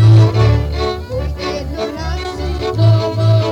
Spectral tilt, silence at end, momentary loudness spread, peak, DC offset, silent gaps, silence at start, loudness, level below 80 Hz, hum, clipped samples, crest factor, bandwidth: -7.5 dB/octave; 0 s; 11 LU; -4 dBFS; under 0.1%; none; 0 s; -16 LUFS; -24 dBFS; none; under 0.1%; 10 dB; 7.4 kHz